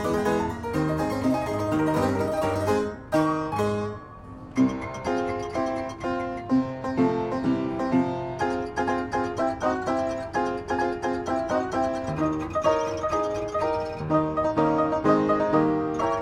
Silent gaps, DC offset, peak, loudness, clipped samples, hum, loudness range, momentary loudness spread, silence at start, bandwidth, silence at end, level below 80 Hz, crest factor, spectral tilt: none; under 0.1%; -6 dBFS; -26 LUFS; under 0.1%; none; 3 LU; 6 LU; 0 s; 16 kHz; 0 s; -48 dBFS; 18 dB; -6.5 dB/octave